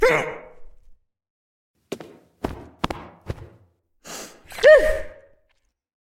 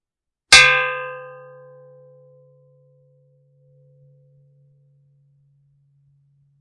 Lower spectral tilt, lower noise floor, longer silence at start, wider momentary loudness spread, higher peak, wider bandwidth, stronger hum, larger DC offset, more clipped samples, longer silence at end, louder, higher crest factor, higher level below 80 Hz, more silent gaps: first, -4 dB/octave vs 0.5 dB/octave; second, -68 dBFS vs -82 dBFS; second, 0 s vs 0.5 s; second, 24 LU vs 28 LU; about the same, -2 dBFS vs 0 dBFS; first, 15.5 kHz vs 12 kHz; neither; neither; neither; second, 1 s vs 5.35 s; second, -19 LUFS vs -12 LUFS; about the same, 22 dB vs 24 dB; first, -42 dBFS vs -52 dBFS; first, 1.30-1.74 s vs none